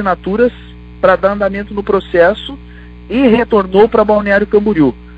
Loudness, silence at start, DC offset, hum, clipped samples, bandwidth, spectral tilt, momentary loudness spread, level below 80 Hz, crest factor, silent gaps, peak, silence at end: -12 LUFS; 0 s; under 0.1%; 60 Hz at -35 dBFS; under 0.1%; 5.2 kHz; -8.5 dB/octave; 9 LU; -34 dBFS; 12 dB; none; 0 dBFS; 0 s